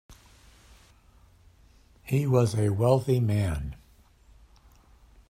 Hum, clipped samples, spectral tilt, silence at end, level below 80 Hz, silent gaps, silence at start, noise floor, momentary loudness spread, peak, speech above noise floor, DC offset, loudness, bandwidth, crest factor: none; under 0.1%; -7.5 dB/octave; 1.55 s; -48 dBFS; none; 0.1 s; -58 dBFS; 17 LU; -8 dBFS; 33 dB; under 0.1%; -26 LUFS; 15.5 kHz; 22 dB